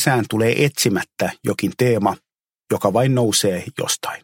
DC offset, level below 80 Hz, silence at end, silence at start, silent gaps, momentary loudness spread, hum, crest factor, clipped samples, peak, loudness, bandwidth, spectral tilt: under 0.1%; -58 dBFS; 0.05 s; 0 s; 2.55-2.59 s; 7 LU; none; 18 dB; under 0.1%; -2 dBFS; -19 LUFS; 17 kHz; -4.5 dB/octave